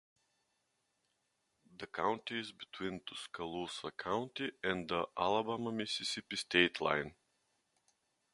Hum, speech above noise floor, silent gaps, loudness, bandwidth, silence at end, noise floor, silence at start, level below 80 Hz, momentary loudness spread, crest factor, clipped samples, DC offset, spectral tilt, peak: none; 44 dB; none; -37 LUFS; 11.5 kHz; 1.2 s; -82 dBFS; 1.7 s; -70 dBFS; 13 LU; 28 dB; under 0.1%; under 0.1%; -3.5 dB/octave; -12 dBFS